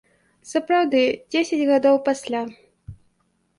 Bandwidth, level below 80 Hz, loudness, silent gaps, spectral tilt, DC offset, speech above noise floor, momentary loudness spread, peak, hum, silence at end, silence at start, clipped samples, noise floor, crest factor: 11.5 kHz; -58 dBFS; -21 LUFS; none; -4 dB/octave; under 0.1%; 48 dB; 10 LU; -6 dBFS; none; 0.65 s; 0.45 s; under 0.1%; -68 dBFS; 16 dB